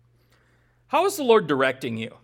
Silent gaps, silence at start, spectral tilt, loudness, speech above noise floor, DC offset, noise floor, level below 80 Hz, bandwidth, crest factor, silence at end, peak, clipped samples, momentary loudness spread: none; 0.9 s; -4.5 dB/octave; -22 LUFS; 40 dB; under 0.1%; -62 dBFS; -68 dBFS; 17.5 kHz; 18 dB; 0.15 s; -6 dBFS; under 0.1%; 10 LU